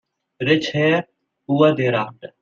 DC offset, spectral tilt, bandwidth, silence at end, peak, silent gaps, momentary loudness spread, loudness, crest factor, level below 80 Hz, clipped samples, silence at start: under 0.1%; -6.5 dB/octave; 7.4 kHz; 0.15 s; -2 dBFS; none; 8 LU; -19 LUFS; 18 dB; -62 dBFS; under 0.1%; 0.4 s